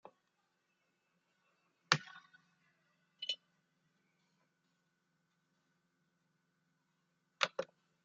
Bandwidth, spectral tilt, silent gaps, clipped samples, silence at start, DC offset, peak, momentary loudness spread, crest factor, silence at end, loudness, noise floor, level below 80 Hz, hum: 7.4 kHz; -0.5 dB/octave; none; under 0.1%; 1.9 s; under 0.1%; -8 dBFS; 19 LU; 40 dB; 0.4 s; -38 LUFS; -82 dBFS; under -90 dBFS; none